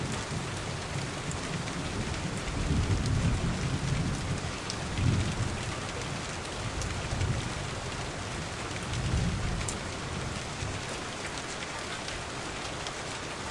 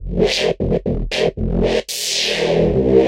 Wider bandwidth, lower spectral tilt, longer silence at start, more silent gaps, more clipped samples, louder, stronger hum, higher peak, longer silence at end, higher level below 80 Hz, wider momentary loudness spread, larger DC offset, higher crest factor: second, 11.5 kHz vs 16 kHz; about the same, -4.5 dB/octave vs -4.5 dB/octave; about the same, 0 s vs 0 s; neither; neither; second, -33 LUFS vs -18 LUFS; neither; second, -12 dBFS vs -2 dBFS; about the same, 0 s vs 0 s; second, -42 dBFS vs -28 dBFS; about the same, 6 LU vs 4 LU; neither; about the same, 20 dB vs 16 dB